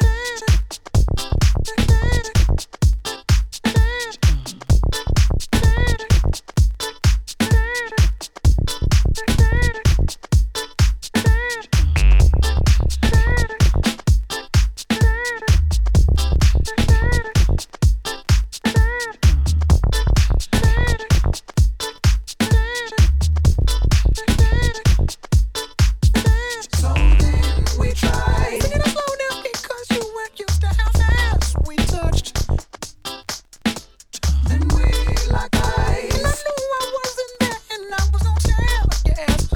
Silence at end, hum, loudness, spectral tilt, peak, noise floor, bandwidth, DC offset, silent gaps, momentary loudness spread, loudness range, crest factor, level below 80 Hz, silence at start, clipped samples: 0 s; none; -19 LUFS; -5 dB/octave; -2 dBFS; -36 dBFS; 17 kHz; under 0.1%; none; 6 LU; 3 LU; 14 dB; -18 dBFS; 0 s; under 0.1%